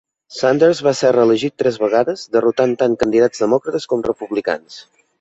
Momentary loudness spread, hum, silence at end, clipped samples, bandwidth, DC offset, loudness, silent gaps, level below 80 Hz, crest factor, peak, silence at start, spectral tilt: 7 LU; none; 0.4 s; under 0.1%; 8.2 kHz; under 0.1%; -16 LUFS; none; -54 dBFS; 14 dB; -2 dBFS; 0.3 s; -5.5 dB/octave